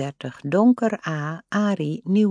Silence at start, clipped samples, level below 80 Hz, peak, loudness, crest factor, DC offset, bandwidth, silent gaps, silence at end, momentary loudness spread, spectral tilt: 0 s; under 0.1%; -72 dBFS; -6 dBFS; -22 LUFS; 16 dB; under 0.1%; 9.8 kHz; none; 0 s; 11 LU; -7.5 dB/octave